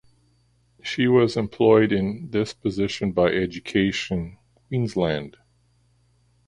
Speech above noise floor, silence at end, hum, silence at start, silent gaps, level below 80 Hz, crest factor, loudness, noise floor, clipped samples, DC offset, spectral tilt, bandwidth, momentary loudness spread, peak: 41 dB; 1.2 s; 60 Hz at -50 dBFS; 0.85 s; none; -50 dBFS; 20 dB; -23 LUFS; -63 dBFS; under 0.1%; under 0.1%; -6.5 dB/octave; 11 kHz; 12 LU; -4 dBFS